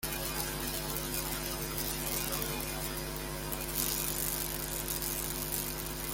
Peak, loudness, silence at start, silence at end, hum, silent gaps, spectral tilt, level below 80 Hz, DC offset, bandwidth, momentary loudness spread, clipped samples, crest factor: -10 dBFS; -34 LUFS; 0 s; 0 s; none; none; -2.5 dB/octave; -46 dBFS; under 0.1%; 17 kHz; 5 LU; under 0.1%; 26 dB